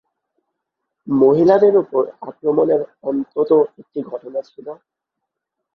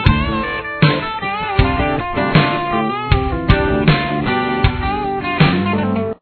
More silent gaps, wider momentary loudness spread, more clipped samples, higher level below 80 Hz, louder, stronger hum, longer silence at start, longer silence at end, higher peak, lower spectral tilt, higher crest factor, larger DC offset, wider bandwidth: neither; first, 17 LU vs 6 LU; neither; second, -64 dBFS vs -26 dBFS; about the same, -17 LUFS vs -16 LUFS; neither; first, 1.05 s vs 0 s; first, 1 s vs 0.05 s; about the same, -2 dBFS vs 0 dBFS; about the same, -9.5 dB/octave vs -9.5 dB/octave; about the same, 18 dB vs 16 dB; neither; first, 6 kHz vs 4.6 kHz